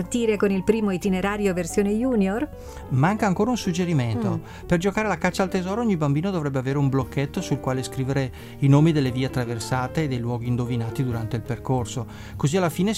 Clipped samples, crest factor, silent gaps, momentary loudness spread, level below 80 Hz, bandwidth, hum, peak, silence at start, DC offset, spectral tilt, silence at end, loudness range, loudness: under 0.1%; 18 dB; none; 6 LU; -44 dBFS; 15.5 kHz; none; -6 dBFS; 0 s; under 0.1%; -6.5 dB/octave; 0 s; 3 LU; -24 LUFS